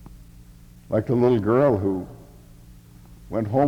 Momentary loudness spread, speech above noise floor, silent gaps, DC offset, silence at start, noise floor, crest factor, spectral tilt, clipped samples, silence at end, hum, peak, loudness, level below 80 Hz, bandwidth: 12 LU; 26 dB; none; under 0.1%; 0.05 s; -47 dBFS; 18 dB; -9.5 dB/octave; under 0.1%; 0 s; none; -6 dBFS; -22 LUFS; -48 dBFS; 16.5 kHz